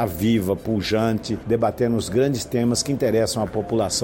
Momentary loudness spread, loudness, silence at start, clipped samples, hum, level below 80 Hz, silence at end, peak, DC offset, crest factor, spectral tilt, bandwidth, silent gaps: 3 LU; -22 LUFS; 0 s; under 0.1%; none; -46 dBFS; 0 s; -8 dBFS; under 0.1%; 14 dB; -5 dB/octave; 17 kHz; none